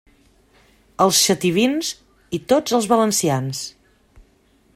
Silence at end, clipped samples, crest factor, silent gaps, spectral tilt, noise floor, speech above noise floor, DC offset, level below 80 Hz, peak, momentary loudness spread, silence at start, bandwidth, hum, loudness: 0.55 s; under 0.1%; 18 dB; none; -3.5 dB/octave; -58 dBFS; 39 dB; under 0.1%; -56 dBFS; -2 dBFS; 15 LU; 1 s; 16 kHz; none; -19 LUFS